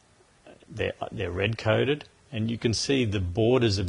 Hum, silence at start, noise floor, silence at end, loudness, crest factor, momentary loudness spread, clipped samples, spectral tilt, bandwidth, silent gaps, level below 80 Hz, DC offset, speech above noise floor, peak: none; 0.45 s; -56 dBFS; 0 s; -27 LUFS; 20 dB; 9 LU; under 0.1%; -5.5 dB/octave; 11 kHz; none; -44 dBFS; under 0.1%; 30 dB; -8 dBFS